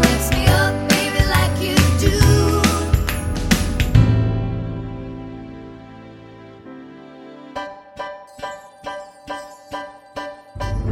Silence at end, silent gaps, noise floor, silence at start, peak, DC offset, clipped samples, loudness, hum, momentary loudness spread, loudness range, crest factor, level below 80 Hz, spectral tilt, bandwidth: 0 s; none; -40 dBFS; 0 s; 0 dBFS; under 0.1%; under 0.1%; -18 LUFS; none; 24 LU; 18 LU; 20 dB; -28 dBFS; -5 dB/octave; 16.5 kHz